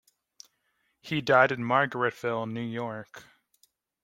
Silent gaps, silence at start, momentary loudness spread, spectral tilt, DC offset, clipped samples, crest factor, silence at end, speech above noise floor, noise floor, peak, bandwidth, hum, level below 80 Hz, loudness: none; 1.05 s; 15 LU; -6 dB/octave; under 0.1%; under 0.1%; 24 dB; 0.8 s; 48 dB; -75 dBFS; -6 dBFS; 16.5 kHz; none; -70 dBFS; -27 LUFS